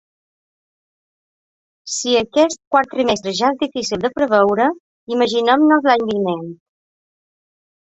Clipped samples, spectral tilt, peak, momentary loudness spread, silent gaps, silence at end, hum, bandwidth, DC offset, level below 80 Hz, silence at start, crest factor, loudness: under 0.1%; -3.5 dB/octave; -2 dBFS; 10 LU; 2.67-2.71 s, 4.80-5.07 s; 1.4 s; none; 8.2 kHz; under 0.1%; -58 dBFS; 1.85 s; 18 dB; -17 LUFS